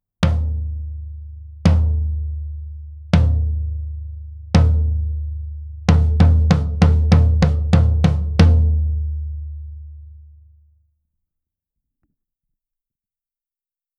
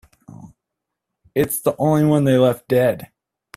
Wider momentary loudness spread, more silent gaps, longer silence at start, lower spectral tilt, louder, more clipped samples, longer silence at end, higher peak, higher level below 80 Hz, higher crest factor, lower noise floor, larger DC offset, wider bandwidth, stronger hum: first, 20 LU vs 7 LU; neither; second, 0.2 s vs 0.4 s; first, -8 dB/octave vs -6.5 dB/octave; about the same, -18 LUFS vs -18 LUFS; neither; first, 3.8 s vs 0.5 s; first, 0 dBFS vs -4 dBFS; first, -22 dBFS vs -56 dBFS; about the same, 18 dB vs 16 dB; first, under -90 dBFS vs -81 dBFS; neither; second, 7.2 kHz vs 16 kHz; neither